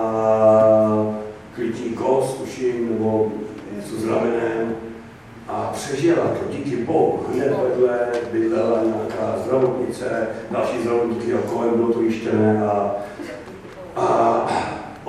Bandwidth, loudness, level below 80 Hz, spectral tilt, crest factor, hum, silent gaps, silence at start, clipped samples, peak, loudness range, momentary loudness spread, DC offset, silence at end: 13 kHz; -20 LUFS; -54 dBFS; -7 dB/octave; 16 dB; none; none; 0 s; under 0.1%; -4 dBFS; 3 LU; 14 LU; under 0.1%; 0 s